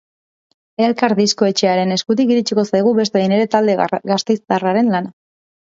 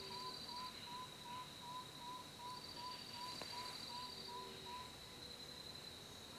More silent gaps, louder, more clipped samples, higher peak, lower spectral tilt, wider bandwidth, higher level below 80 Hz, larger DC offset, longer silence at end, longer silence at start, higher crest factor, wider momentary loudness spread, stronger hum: neither; first, -16 LUFS vs -50 LUFS; neither; first, 0 dBFS vs -34 dBFS; first, -5 dB/octave vs -2.5 dB/octave; second, 7.8 kHz vs 16 kHz; first, -64 dBFS vs -74 dBFS; neither; first, 0.65 s vs 0 s; first, 0.8 s vs 0 s; about the same, 16 dB vs 18 dB; about the same, 4 LU vs 4 LU; neither